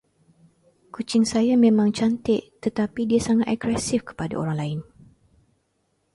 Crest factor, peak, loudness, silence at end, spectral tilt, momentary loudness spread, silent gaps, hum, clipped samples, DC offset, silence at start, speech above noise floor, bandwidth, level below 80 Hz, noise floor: 16 dB; -6 dBFS; -22 LUFS; 1.3 s; -6 dB/octave; 12 LU; none; none; under 0.1%; under 0.1%; 0.95 s; 49 dB; 11.5 kHz; -54 dBFS; -71 dBFS